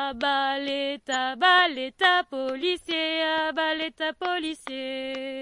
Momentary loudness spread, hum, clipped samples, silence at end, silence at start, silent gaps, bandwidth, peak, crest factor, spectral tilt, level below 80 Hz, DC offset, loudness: 12 LU; none; under 0.1%; 0 s; 0 s; none; 11.5 kHz; -8 dBFS; 18 dB; -1.5 dB/octave; -64 dBFS; under 0.1%; -25 LUFS